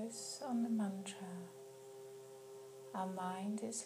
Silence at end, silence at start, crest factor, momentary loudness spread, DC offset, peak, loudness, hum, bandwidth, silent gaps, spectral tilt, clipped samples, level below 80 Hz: 0 s; 0 s; 14 dB; 16 LU; under 0.1%; -30 dBFS; -43 LUFS; none; 15.5 kHz; none; -4.5 dB/octave; under 0.1%; under -90 dBFS